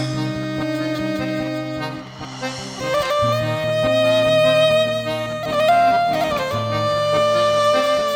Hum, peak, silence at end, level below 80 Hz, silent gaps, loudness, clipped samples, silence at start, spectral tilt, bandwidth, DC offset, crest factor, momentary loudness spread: none; -6 dBFS; 0 s; -50 dBFS; none; -19 LUFS; under 0.1%; 0 s; -5 dB/octave; 17.5 kHz; under 0.1%; 14 dB; 12 LU